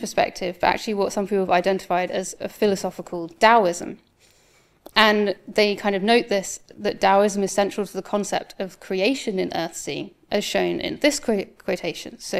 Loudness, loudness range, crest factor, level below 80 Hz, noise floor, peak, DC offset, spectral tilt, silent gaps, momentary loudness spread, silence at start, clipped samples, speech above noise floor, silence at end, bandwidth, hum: -22 LUFS; 5 LU; 22 dB; -56 dBFS; -58 dBFS; 0 dBFS; under 0.1%; -3.5 dB/octave; none; 13 LU; 0 s; under 0.1%; 36 dB; 0 s; 15 kHz; none